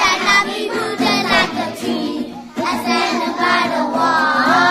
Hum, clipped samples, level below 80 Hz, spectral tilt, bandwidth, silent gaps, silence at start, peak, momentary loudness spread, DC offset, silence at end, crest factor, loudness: none; under 0.1%; -50 dBFS; -3 dB/octave; 15.5 kHz; none; 0 s; -2 dBFS; 9 LU; under 0.1%; 0 s; 16 dB; -16 LUFS